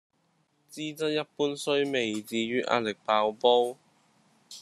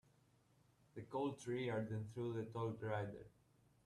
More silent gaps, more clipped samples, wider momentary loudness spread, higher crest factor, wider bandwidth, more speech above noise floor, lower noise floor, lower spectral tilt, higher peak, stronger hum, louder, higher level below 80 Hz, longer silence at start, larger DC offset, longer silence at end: neither; neither; about the same, 13 LU vs 15 LU; first, 22 dB vs 16 dB; about the same, 13 kHz vs 12 kHz; first, 43 dB vs 30 dB; about the same, -71 dBFS vs -74 dBFS; second, -4 dB/octave vs -7 dB/octave; first, -8 dBFS vs -30 dBFS; neither; first, -28 LUFS vs -45 LUFS; about the same, -76 dBFS vs -78 dBFS; second, 0.7 s vs 0.95 s; neither; second, 0 s vs 0.55 s